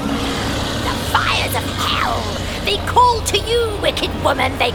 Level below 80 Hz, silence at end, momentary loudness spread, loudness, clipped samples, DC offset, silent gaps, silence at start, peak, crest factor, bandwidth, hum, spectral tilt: -30 dBFS; 0 s; 7 LU; -17 LUFS; under 0.1%; under 0.1%; none; 0 s; -2 dBFS; 16 dB; 20 kHz; none; -4 dB/octave